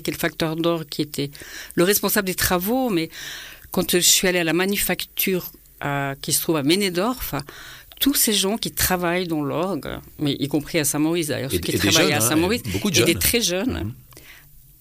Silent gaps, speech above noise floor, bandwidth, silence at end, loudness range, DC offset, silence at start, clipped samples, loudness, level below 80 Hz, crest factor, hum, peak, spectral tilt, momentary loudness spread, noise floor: none; 25 dB; 15.5 kHz; 0.4 s; 3 LU; under 0.1%; 0 s; under 0.1%; -21 LUFS; -44 dBFS; 16 dB; none; -6 dBFS; -3 dB/octave; 13 LU; -47 dBFS